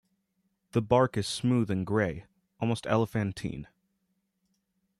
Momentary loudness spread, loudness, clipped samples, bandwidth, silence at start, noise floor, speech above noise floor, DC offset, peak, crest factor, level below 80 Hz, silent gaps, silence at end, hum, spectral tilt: 12 LU; -29 LUFS; under 0.1%; 13 kHz; 0.75 s; -78 dBFS; 49 dB; under 0.1%; -12 dBFS; 20 dB; -58 dBFS; none; 1.35 s; none; -6.5 dB/octave